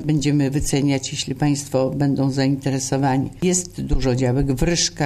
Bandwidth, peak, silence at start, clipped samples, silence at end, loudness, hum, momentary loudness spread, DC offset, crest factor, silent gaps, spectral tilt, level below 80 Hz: 14 kHz; -6 dBFS; 0 s; under 0.1%; 0 s; -20 LUFS; none; 3 LU; under 0.1%; 14 dB; none; -5 dB/octave; -32 dBFS